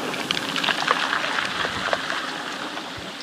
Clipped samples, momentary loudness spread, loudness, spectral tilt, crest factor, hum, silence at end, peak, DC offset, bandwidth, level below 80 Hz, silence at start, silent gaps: under 0.1%; 9 LU; -24 LUFS; -2 dB/octave; 24 dB; none; 0 s; -2 dBFS; under 0.1%; 15.5 kHz; -58 dBFS; 0 s; none